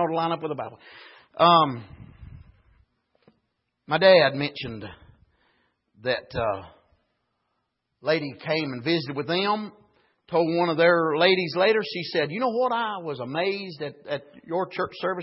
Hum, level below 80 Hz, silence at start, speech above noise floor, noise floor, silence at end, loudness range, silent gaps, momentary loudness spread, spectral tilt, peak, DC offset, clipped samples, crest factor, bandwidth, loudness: none; -60 dBFS; 0 s; 53 dB; -77 dBFS; 0 s; 8 LU; none; 16 LU; -9 dB/octave; -4 dBFS; under 0.1%; under 0.1%; 22 dB; 5.8 kHz; -24 LUFS